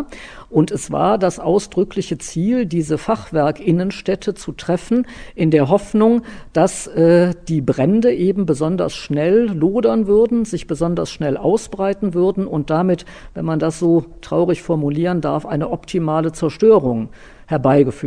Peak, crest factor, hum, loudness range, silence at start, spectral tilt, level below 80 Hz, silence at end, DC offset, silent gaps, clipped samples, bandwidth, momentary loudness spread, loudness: -2 dBFS; 16 dB; none; 3 LU; 0 s; -7 dB/octave; -42 dBFS; 0 s; under 0.1%; none; under 0.1%; 10 kHz; 8 LU; -17 LUFS